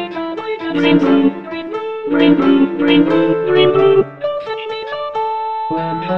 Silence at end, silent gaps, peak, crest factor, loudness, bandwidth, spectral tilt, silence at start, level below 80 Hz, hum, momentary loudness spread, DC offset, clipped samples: 0 s; none; 0 dBFS; 14 dB; -15 LUFS; 6 kHz; -8 dB/octave; 0 s; -52 dBFS; none; 12 LU; 0.6%; under 0.1%